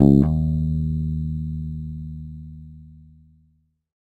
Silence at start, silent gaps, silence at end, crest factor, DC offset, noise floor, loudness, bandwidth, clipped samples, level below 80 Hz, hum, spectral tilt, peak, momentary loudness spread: 0 s; none; 1 s; 22 dB; under 0.1%; -64 dBFS; -23 LUFS; 4.4 kHz; under 0.1%; -32 dBFS; none; -12 dB/octave; 0 dBFS; 22 LU